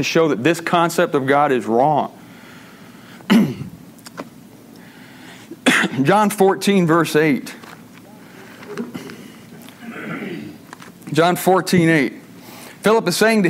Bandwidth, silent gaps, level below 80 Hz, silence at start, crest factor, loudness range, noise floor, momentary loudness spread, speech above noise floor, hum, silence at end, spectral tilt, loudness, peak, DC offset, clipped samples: 16 kHz; none; -62 dBFS; 0 s; 18 dB; 9 LU; -42 dBFS; 23 LU; 26 dB; none; 0 s; -5 dB/octave; -17 LUFS; -2 dBFS; under 0.1%; under 0.1%